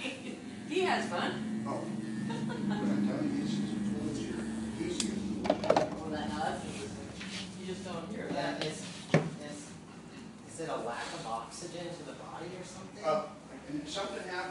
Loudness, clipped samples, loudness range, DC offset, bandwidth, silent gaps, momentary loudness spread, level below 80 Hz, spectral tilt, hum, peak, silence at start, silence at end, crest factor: -36 LUFS; under 0.1%; 5 LU; under 0.1%; 11.5 kHz; none; 13 LU; -62 dBFS; -5 dB/octave; none; -10 dBFS; 0 s; 0 s; 26 dB